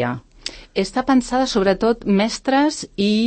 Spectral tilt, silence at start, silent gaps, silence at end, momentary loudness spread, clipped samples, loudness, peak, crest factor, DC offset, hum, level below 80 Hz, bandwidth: -5 dB/octave; 0 s; none; 0 s; 9 LU; under 0.1%; -19 LUFS; -4 dBFS; 14 dB; under 0.1%; none; -44 dBFS; 8.8 kHz